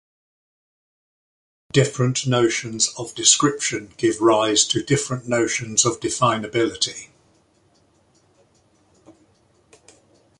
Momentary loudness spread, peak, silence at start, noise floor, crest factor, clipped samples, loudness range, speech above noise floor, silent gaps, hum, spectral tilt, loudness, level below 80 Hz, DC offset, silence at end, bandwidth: 7 LU; 0 dBFS; 1.75 s; -60 dBFS; 22 dB; under 0.1%; 8 LU; 40 dB; none; none; -3 dB/octave; -19 LUFS; -58 dBFS; under 0.1%; 1.3 s; 11.5 kHz